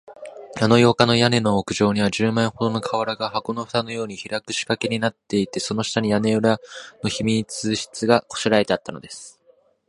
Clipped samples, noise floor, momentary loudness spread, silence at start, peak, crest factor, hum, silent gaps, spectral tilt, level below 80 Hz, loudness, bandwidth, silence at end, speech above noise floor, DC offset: under 0.1%; -58 dBFS; 13 LU; 0.1 s; 0 dBFS; 22 dB; none; none; -5 dB/octave; -54 dBFS; -21 LUFS; 11.5 kHz; 0.6 s; 37 dB; under 0.1%